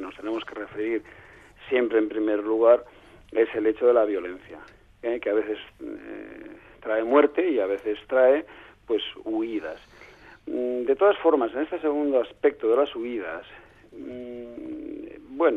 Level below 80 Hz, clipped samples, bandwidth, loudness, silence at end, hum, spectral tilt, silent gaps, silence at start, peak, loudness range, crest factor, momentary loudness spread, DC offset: -60 dBFS; under 0.1%; 4.9 kHz; -24 LUFS; 0 s; none; -6.5 dB/octave; none; 0 s; -6 dBFS; 4 LU; 20 dB; 20 LU; under 0.1%